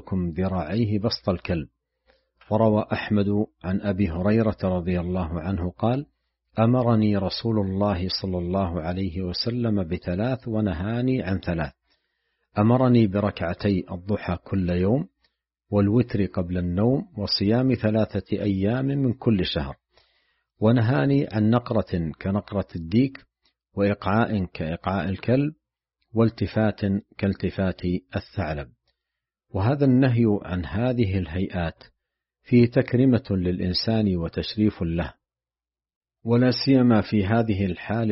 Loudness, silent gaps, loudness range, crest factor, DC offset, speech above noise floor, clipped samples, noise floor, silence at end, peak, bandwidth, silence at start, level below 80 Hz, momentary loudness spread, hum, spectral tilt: -24 LUFS; 35.96-36.01 s; 3 LU; 18 dB; under 0.1%; over 67 dB; under 0.1%; under -90 dBFS; 0 s; -6 dBFS; 5.8 kHz; 0.05 s; -46 dBFS; 9 LU; none; -6.5 dB/octave